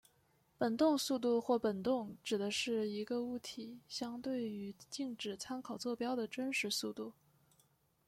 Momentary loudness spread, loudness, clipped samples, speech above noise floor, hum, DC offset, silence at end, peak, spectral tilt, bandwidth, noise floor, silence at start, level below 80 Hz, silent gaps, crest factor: 11 LU; -38 LUFS; under 0.1%; 36 dB; none; under 0.1%; 0.95 s; -20 dBFS; -4 dB/octave; 16 kHz; -74 dBFS; 0.6 s; -78 dBFS; none; 18 dB